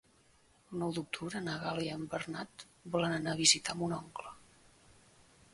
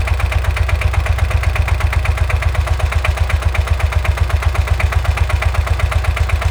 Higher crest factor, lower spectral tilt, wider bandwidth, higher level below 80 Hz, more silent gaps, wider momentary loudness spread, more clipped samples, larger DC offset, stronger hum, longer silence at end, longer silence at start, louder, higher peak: first, 26 dB vs 12 dB; second, -3 dB/octave vs -5 dB/octave; second, 11.5 kHz vs 18.5 kHz; second, -68 dBFS vs -16 dBFS; neither; first, 20 LU vs 1 LU; neither; neither; neither; first, 1.15 s vs 0 s; first, 0.7 s vs 0 s; second, -34 LUFS vs -17 LUFS; second, -12 dBFS vs -2 dBFS